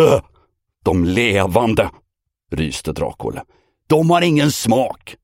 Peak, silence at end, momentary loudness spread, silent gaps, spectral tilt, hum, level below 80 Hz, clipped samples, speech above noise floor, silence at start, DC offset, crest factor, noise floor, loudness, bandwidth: 0 dBFS; 0.1 s; 10 LU; none; -5.5 dB/octave; none; -40 dBFS; under 0.1%; 45 dB; 0 s; under 0.1%; 18 dB; -61 dBFS; -17 LUFS; 16.5 kHz